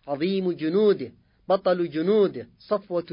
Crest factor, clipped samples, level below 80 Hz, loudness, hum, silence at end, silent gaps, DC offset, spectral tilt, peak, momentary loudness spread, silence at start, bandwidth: 14 dB; under 0.1%; -66 dBFS; -24 LUFS; none; 0 s; none; under 0.1%; -11 dB/octave; -10 dBFS; 8 LU; 0.05 s; 5.4 kHz